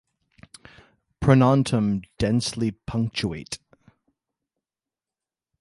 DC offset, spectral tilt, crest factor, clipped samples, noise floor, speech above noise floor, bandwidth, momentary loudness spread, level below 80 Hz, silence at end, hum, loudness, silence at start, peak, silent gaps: under 0.1%; -6.5 dB/octave; 20 dB; under 0.1%; under -90 dBFS; over 68 dB; 11.5 kHz; 14 LU; -48 dBFS; 2.05 s; none; -23 LUFS; 1.2 s; -4 dBFS; none